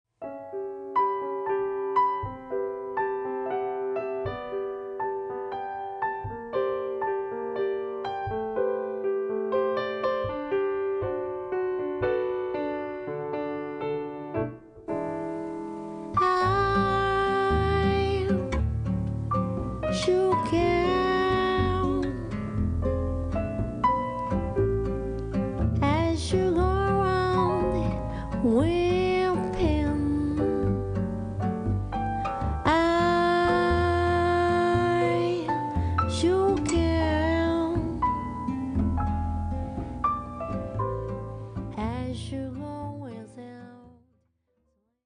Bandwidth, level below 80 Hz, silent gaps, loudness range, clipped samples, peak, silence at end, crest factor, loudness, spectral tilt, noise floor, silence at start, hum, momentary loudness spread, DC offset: 10 kHz; -40 dBFS; none; 7 LU; under 0.1%; -10 dBFS; 1.15 s; 16 dB; -27 LUFS; -7 dB/octave; -73 dBFS; 0.2 s; none; 10 LU; under 0.1%